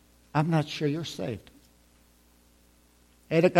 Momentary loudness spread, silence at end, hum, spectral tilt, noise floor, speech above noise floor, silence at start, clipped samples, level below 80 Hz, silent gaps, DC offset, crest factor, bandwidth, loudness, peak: 10 LU; 0 s; 60 Hz at -60 dBFS; -6.5 dB/octave; -61 dBFS; 35 dB; 0.35 s; under 0.1%; -62 dBFS; none; under 0.1%; 24 dB; 14.5 kHz; -29 LUFS; -6 dBFS